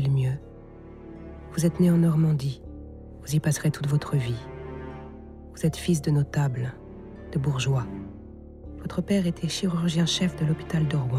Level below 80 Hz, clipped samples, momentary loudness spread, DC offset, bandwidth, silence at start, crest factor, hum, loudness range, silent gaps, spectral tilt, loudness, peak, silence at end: -46 dBFS; under 0.1%; 21 LU; under 0.1%; 14 kHz; 0 s; 16 dB; none; 4 LU; none; -6 dB/octave; -26 LUFS; -10 dBFS; 0 s